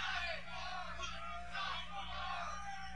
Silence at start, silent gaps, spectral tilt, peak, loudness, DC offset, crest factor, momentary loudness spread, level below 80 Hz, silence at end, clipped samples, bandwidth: 0 s; none; -2.5 dB/octave; -28 dBFS; -43 LUFS; 0.4%; 16 dB; 4 LU; -56 dBFS; 0 s; under 0.1%; 11.5 kHz